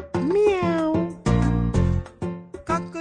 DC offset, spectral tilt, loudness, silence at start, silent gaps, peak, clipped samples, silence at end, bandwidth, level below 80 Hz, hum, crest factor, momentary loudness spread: under 0.1%; -8 dB/octave; -23 LUFS; 0 s; none; -8 dBFS; under 0.1%; 0 s; 10 kHz; -32 dBFS; none; 14 dB; 12 LU